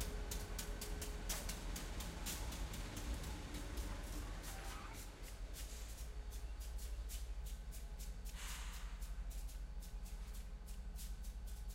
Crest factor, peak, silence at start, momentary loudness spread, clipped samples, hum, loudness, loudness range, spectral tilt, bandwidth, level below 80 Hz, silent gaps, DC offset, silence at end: 18 dB; -28 dBFS; 0 s; 7 LU; under 0.1%; none; -49 LUFS; 4 LU; -3.5 dB/octave; 16 kHz; -48 dBFS; none; under 0.1%; 0 s